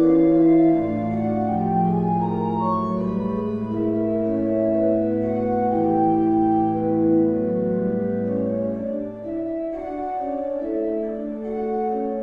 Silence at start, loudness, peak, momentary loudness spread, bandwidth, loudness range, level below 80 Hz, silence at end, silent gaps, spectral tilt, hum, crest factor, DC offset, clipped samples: 0 s; -22 LUFS; -8 dBFS; 9 LU; 3.9 kHz; 6 LU; -50 dBFS; 0 s; none; -11.5 dB/octave; none; 14 dB; under 0.1%; under 0.1%